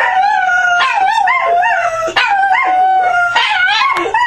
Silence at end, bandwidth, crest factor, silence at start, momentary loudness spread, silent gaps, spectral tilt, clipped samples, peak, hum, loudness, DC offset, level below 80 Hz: 0 s; 11 kHz; 12 dB; 0 s; 2 LU; none; -1 dB/octave; under 0.1%; 0 dBFS; none; -11 LUFS; under 0.1%; -50 dBFS